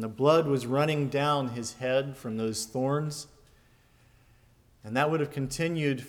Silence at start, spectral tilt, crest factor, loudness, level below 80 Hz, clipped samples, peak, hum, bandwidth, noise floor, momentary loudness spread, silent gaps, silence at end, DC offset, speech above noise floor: 0 s; -5.5 dB/octave; 20 dB; -28 LUFS; -62 dBFS; under 0.1%; -10 dBFS; none; 17.5 kHz; -61 dBFS; 10 LU; none; 0 s; under 0.1%; 33 dB